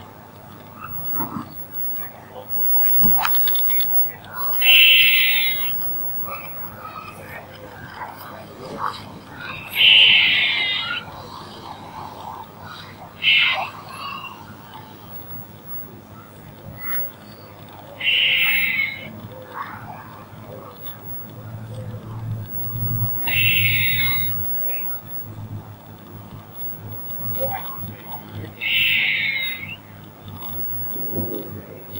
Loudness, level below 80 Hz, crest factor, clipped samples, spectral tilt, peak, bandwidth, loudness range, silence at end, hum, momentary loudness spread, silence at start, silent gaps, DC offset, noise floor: -17 LUFS; -54 dBFS; 22 dB; under 0.1%; -3.5 dB/octave; 0 dBFS; 16.5 kHz; 16 LU; 0 s; none; 24 LU; 0 s; none; under 0.1%; -41 dBFS